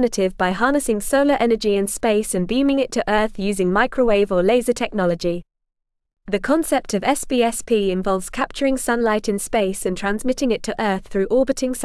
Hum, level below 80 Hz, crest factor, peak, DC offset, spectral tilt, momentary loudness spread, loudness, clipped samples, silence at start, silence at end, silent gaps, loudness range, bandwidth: none; -40 dBFS; 14 dB; -4 dBFS; 0.4%; -4.5 dB/octave; 5 LU; -20 LUFS; under 0.1%; 0 s; 0 s; none; 3 LU; 12 kHz